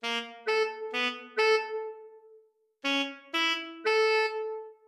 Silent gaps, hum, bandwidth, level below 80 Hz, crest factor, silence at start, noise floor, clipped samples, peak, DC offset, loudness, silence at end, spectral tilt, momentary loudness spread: none; none; 12.5 kHz; -88 dBFS; 16 dB; 0.05 s; -62 dBFS; under 0.1%; -14 dBFS; under 0.1%; -29 LUFS; 0.15 s; -0.5 dB/octave; 11 LU